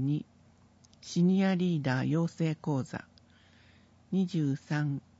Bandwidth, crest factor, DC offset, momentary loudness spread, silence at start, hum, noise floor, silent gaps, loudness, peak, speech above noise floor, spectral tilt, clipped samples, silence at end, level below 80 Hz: 8 kHz; 16 dB; under 0.1%; 12 LU; 0 s; none; -61 dBFS; none; -31 LUFS; -16 dBFS; 32 dB; -7.5 dB/octave; under 0.1%; 0.2 s; -70 dBFS